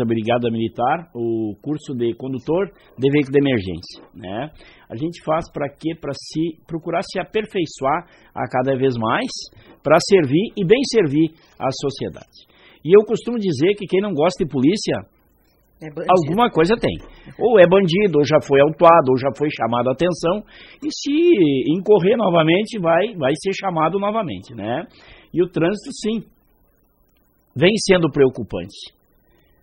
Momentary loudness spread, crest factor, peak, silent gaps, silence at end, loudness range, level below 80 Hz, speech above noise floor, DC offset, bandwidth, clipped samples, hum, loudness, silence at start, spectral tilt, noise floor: 15 LU; 18 dB; 0 dBFS; none; 0.75 s; 9 LU; -50 dBFS; 41 dB; under 0.1%; 11.5 kHz; under 0.1%; none; -19 LUFS; 0 s; -6 dB/octave; -60 dBFS